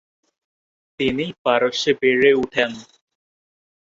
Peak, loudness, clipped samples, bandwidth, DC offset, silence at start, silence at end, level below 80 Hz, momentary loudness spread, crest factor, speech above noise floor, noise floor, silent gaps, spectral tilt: -2 dBFS; -19 LUFS; under 0.1%; 7.6 kHz; under 0.1%; 1 s; 1.1 s; -56 dBFS; 9 LU; 20 dB; over 71 dB; under -90 dBFS; 1.38-1.45 s; -4 dB/octave